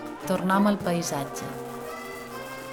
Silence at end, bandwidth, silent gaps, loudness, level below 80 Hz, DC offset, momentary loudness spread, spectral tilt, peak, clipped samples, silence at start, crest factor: 0 s; 19.5 kHz; none; -28 LUFS; -60 dBFS; under 0.1%; 14 LU; -5 dB/octave; -10 dBFS; under 0.1%; 0 s; 18 dB